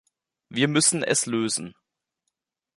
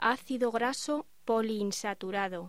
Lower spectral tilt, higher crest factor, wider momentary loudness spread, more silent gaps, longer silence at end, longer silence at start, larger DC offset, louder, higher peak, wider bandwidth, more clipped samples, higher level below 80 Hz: about the same, -3 dB/octave vs -3.5 dB/octave; about the same, 22 dB vs 18 dB; first, 12 LU vs 5 LU; neither; first, 1.05 s vs 0 s; first, 0.5 s vs 0 s; second, under 0.1% vs 0.2%; first, -22 LUFS vs -32 LUFS; first, -4 dBFS vs -14 dBFS; second, 11.5 kHz vs 16 kHz; neither; about the same, -70 dBFS vs -72 dBFS